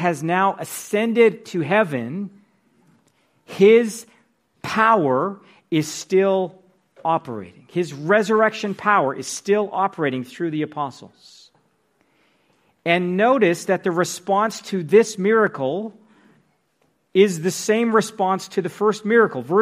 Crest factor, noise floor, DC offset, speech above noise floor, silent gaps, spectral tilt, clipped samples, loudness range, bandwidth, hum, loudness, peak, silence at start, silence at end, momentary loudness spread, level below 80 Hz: 18 dB; -66 dBFS; under 0.1%; 47 dB; none; -5 dB/octave; under 0.1%; 4 LU; 15.5 kHz; none; -20 LUFS; -2 dBFS; 0 s; 0 s; 12 LU; -72 dBFS